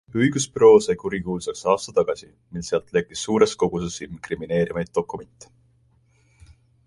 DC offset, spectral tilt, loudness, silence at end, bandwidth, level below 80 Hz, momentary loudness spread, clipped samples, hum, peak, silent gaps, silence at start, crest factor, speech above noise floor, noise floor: under 0.1%; -5 dB/octave; -22 LUFS; 1.6 s; 11.5 kHz; -52 dBFS; 18 LU; under 0.1%; none; -4 dBFS; none; 0.15 s; 20 dB; 39 dB; -61 dBFS